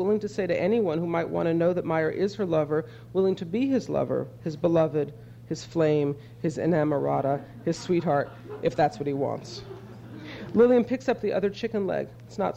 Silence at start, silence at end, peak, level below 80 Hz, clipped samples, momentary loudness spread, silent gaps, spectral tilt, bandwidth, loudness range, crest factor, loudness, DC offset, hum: 0 s; 0 s; -10 dBFS; -58 dBFS; under 0.1%; 12 LU; none; -7.5 dB/octave; 9 kHz; 1 LU; 16 dB; -26 LUFS; under 0.1%; none